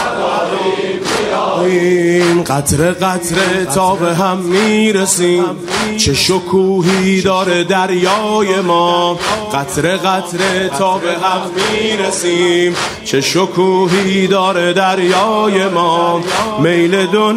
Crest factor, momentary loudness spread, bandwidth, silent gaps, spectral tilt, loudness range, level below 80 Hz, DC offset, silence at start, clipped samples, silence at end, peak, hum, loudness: 12 dB; 4 LU; 16 kHz; none; -4 dB/octave; 2 LU; -46 dBFS; under 0.1%; 0 s; under 0.1%; 0 s; 0 dBFS; none; -13 LUFS